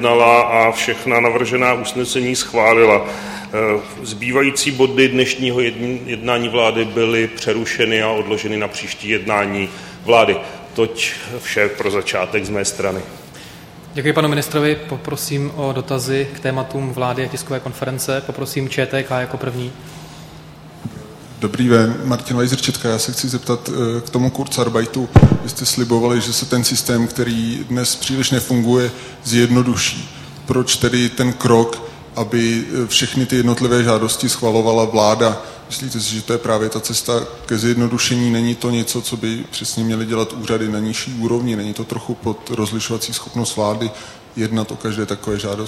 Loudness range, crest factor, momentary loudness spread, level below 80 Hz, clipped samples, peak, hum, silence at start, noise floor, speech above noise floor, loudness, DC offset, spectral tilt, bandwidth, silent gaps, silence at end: 6 LU; 18 dB; 11 LU; -40 dBFS; under 0.1%; 0 dBFS; none; 0 s; -38 dBFS; 20 dB; -17 LUFS; under 0.1%; -4.5 dB/octave; 16 kHz; none; 0 s